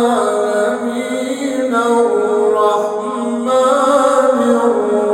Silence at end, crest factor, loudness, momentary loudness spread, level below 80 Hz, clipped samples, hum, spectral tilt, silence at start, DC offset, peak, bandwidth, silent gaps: 0 s; 12 dB; -14 LUFS; 8 LU; -62 dBFS; under 0.1%; none; -4 dB/octave; 0 s; under 0.1%; -2 dBFS; 16.5 kHz; none